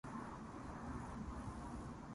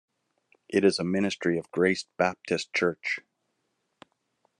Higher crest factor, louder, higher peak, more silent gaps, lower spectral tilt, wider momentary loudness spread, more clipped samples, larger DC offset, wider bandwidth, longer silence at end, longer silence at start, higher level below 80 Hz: second, 14 dB vs 20 dB; second, -50 LUFS vs -27 LUFS; second, -36 dBFS vs -8 dBFS; neither; first, -6.5 dB/octave vs -5 dB/octave; second, 2 LU vs 7 LU; neither; neither; about the same, 11.5 kHz vs 11 kHz; second, 0 s vs 1.4 s; second, 0.05 s vs 0.7 s; first, -56 dBFS vs -72 dBFS